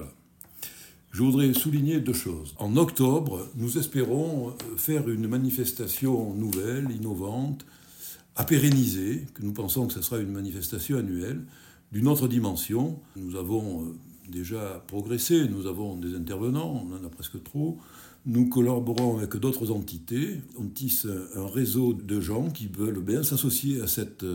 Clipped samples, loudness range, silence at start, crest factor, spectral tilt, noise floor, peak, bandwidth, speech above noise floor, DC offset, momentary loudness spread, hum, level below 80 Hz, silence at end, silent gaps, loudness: under 0.1%; 4 LU; 0 s; 18 dB; -6 dB/octave; -51 dBFS; -10 dBFS; 17 kHz; 24 dB; under 0.1%; 14 LU; none; -54 dBFS; 0 s; none; -27 LUFS